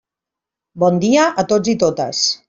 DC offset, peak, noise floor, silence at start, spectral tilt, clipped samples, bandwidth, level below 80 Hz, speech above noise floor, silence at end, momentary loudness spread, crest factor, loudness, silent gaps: under 0.1%; -2 dBFS; -85 dBFS; 0.75 s; -4 dB/octave; under 0.1%; 7.8 kHz; -58 dBFS; 70 dB; 0.1 s; 4 LU; 14 dB; -16 LUFS; none